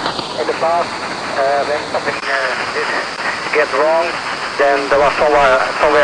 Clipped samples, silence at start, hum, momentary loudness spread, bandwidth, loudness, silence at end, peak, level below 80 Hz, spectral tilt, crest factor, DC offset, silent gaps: under 0.1%; 0 s; none; 8 LU; 10 kHz; -15 LUFS; 0 s; -2 dBFS; -44 dBFS; -3 dB/octave; 14 dB; 0.1%; none